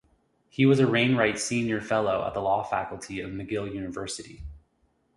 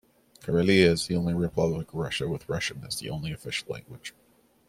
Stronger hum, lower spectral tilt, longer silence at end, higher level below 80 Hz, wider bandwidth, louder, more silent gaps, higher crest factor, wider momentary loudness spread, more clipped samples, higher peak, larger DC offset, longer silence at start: neither; about the same, -5.5 dB/octave vs -5.5 dB/octave; about the same, 0.6 s vs 0.6 s; about the same, -52 dBFS vs -54 dBFS; second, 11.5 kHz vs 15.5 kHz; about the same, -26 LUFS vs -27 LUFS; neither; about the same, 20 dB vs 24 dB; second, 15 LU vs 18 LU; neither; second, -8 dBFS vs -4 dBFS; neither; first, 0.6 s vs 0.45 s